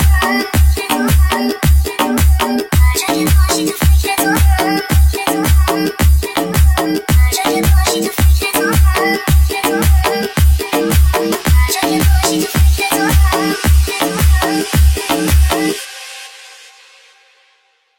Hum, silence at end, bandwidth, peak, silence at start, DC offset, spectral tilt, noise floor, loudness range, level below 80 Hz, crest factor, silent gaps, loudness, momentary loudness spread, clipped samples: none; 1.45 s; 17 kHz; 0 dBFS; 0 s; under 0.1%; -5 dB/octave; -56 dBFS; 2 LU; -16 dBFS; 12 dB; none; -13 LUFS; 3 LU; under 0.1%